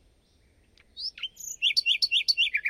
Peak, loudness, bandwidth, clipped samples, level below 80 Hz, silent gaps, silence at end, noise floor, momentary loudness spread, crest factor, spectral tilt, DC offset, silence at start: -12 dBFS; -25 LUFS; 16 kHz; under 0.1%; -66 dBFS; none; 0 s; -63 dBFS; 14 LU; 16 dB; 4 dB/octave; under 0.1%; 0.95 s